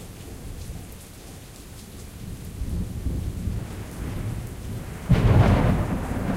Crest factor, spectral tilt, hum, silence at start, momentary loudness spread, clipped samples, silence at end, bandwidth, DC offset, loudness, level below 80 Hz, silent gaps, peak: 18 dB; -7 dB/octave; none; 0 s; 22 LU; under 0.1%; 0 s; 16 kHz; under 0.1%; -25 LUFS; -32 dBFS; none; -6 dBFS